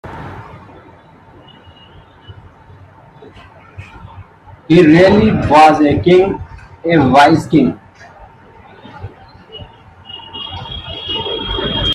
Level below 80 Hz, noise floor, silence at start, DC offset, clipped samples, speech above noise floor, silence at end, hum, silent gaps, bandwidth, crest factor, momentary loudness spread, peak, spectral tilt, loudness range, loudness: -38 dBFS; -42 dBFS; 0.05 s; under 0.1%; under 0.1%; 33 dB; 0 s; none; none; 12 kHz; 14 dB; 26 LU; 0 dBFS; -6.5 dB/octave; 16 LU; -11 LUFS